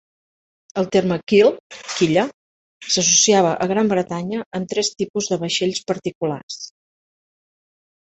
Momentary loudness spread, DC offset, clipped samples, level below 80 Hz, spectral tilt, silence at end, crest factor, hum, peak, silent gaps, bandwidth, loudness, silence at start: 15 LU; under 0.1%; under 0.1%; -60 dBFS; -3.5 dB/octave; 1.4 s; 20 dB; none; -2 dBFS; 1.60-1.70 s, 2.34-2.80 s, 4.46-4.51 s, 5.10-5.14 s, 6.15-6.21 s, 6.43-6.48 s; 8.2 kHz; -19 LUFS; 0.75 s